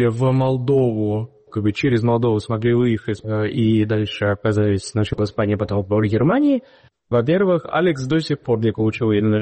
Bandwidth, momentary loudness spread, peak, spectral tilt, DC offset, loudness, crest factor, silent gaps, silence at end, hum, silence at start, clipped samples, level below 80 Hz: 8.8 kHz; 5 LU; -8 dBFS; -7.5 dB/octave; under 0.1%; -19 LUFS; 12 dB; none; 0 s; none; 0 s; under 0.1%; -48 dBFS